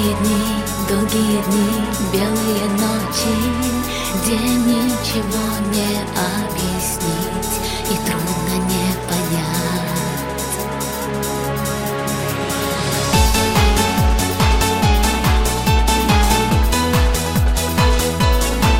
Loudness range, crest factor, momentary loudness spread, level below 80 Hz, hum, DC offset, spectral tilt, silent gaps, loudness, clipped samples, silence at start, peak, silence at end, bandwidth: 5 LU; 16 dB; 6 LU; -24 dBFS; none; under 0.1%; -4.5 dB/octave; none; -18 LUFS; under 0.1%; 0 s; -2 dBFS; 0 s; 17 kHz